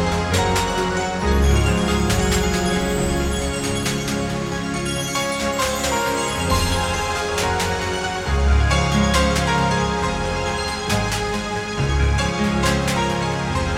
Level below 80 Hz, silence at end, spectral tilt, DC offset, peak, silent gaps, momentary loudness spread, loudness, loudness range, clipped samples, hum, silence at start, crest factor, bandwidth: -26 dBFS; 0 s; -4.5 dB/octave; under 0.1%; -4 dBFS; none; 5 LU; -20 LUFS; 2 LU; under 0.1%; none; 0 s; 16 dB; 16.5 kHz